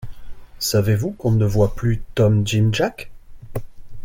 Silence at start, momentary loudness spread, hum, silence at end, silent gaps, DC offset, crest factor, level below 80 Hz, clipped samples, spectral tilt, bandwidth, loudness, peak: 0 s; 16 LU; none; 0 s; none; under 0.1%; 14 dB; -36 dBFS; under 0.1%; -6 dB/octave; 17 kHz; -19 LUFS; -6 dBFS